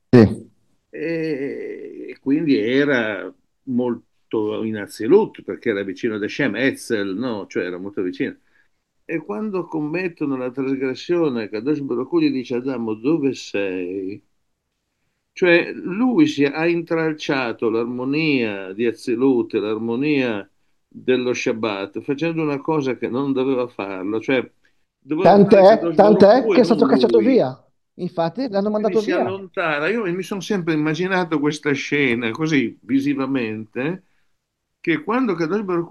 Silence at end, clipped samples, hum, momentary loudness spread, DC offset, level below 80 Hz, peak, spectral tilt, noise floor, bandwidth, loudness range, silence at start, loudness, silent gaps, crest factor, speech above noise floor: 0 s; under 0.1%; none; 12 LU; under 0.1%; -62 dBFS; 0 dBFS; -6.5 dB/octave; -74 dBFS; 12.5 kHz; 9 LU; 0.15 s; -20 LUFS; none; 20 dB; 55 dB